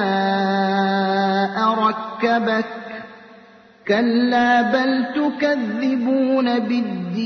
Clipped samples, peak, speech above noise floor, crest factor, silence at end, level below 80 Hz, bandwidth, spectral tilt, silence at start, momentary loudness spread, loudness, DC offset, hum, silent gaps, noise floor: under 0.1%; -6 dBFS; 29 dB; 14 dB; 0 s; -64 dBFS; 6.4 kHz; -6.5 dB/octave; 0 s; 7 LU; -19 LUFS; under 0.1%; none; none; -47 dBFS